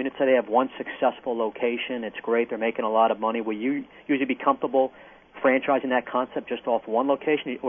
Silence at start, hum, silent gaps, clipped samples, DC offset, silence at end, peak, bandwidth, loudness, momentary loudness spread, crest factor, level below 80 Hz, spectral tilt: 0 s; none; none; under 0.1%; under 0.1%; 0 s; -6 dBFS; 3.6 kHz; -25 LUFS; 7 LU; 18 dB; -70 dBFS; -8.5 dB/octave